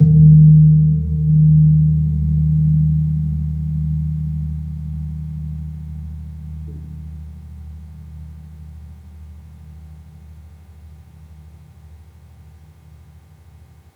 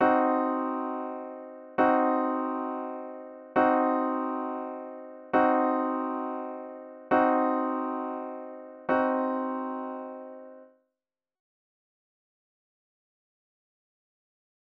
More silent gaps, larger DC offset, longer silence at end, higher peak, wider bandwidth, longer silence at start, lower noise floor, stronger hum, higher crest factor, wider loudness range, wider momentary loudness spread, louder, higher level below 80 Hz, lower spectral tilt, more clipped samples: neither; neither; second, 2.55 s vs 4 s; first, -2 dBFS vs -12 dBFS; second, 0.8 kHz vs 5 kHz; about the same, 0 s vs 0 s; second, -45 dBFS vs -90 dBFS; neither; about the same, 16 dB vs 18 dB; first, 26 LU vs 7 LU; first, 27 LU vs 18 LU; first, -15 LUFS vs -28 LUFS; first, -32 dBFS vs -74 dBFS; first, -12.5 dB/octave vs -8 dB/octave; neither